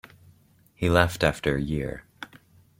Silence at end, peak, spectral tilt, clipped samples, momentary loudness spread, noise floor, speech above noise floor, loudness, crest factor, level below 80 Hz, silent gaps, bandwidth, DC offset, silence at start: 0.55 s; -4 dBFS; -6 dB/octave; under 0.1%; 22 LU; -59 dBFS; 35 dB; -25 LUFS; 24 dB; -44 dBFS; none; 16.5 kHz; under 0.1%; 0.8 s